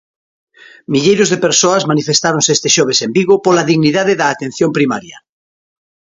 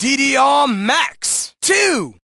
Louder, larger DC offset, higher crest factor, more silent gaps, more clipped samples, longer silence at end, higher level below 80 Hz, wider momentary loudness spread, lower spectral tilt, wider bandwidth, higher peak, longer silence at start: first, -12 LUFS vs -15 LUFS; neither; about the same, 14 dB vs 14 dB; neither; neither; first, 0.95 s vs 0.2 s; about the same, -56 dBFS vs -58 dBFS; about the same, 5 LU vs 6 LU; first, -3.5 dB/octave vs -1.5 dB/octave; second, 7.8 kHz vs 12.5 kHz; first, 0 dBFS vs -4 dBFS; first, 0.9 s vs 0 s